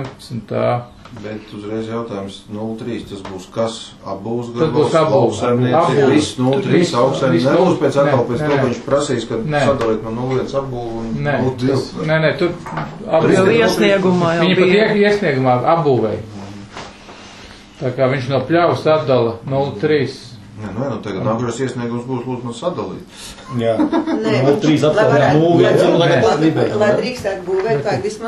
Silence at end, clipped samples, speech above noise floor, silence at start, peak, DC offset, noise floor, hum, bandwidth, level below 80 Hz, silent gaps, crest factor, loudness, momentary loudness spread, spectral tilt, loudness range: 0 s; under 0.1%; 22 dB; 0 s; 0 dBFS; under 0.1%; -38 dBFS; none; 12.5 kHz; -46 dBFS; none; 16 dB; -16 LUFS; 16 LU; -6.5 dB/octave; 9 LU